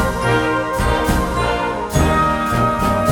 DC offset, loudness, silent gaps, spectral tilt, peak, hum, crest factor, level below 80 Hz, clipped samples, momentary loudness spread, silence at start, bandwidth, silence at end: under 0.1%; -17 LUFS; none; -5.5 dB/octave; -2 dBFS; none; 14 dB; -26 dBFS; under 0.1%; 3 LU; 0 s; 18.5 kHz; 0 s